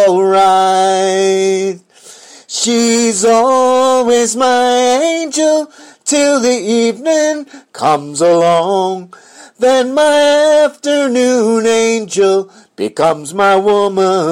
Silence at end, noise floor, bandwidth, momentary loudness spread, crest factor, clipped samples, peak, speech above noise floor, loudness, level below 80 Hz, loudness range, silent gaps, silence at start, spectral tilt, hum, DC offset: 0 s; -39 dBFS; 16 kHz; 8 LU; 10 dB; under 0.1%; 0 dBFS; 28 dB; -12 LUFS; -60 dBFS; 2 LU; none; 0 s; -3 dB/octave; none; under 0.1%